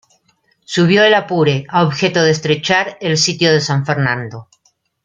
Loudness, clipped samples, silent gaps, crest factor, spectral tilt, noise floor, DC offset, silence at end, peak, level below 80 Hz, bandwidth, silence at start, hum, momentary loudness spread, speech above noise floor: -14 LUFS; under 0.1%; none; 14 dB; -4.5 dB/octave; -60 dBFS; under 0.1%; 0.6 s; 0 dBFS; -56 dBFS; 9.2 kHz; 0.7 s; none; 8 LU; 46 dB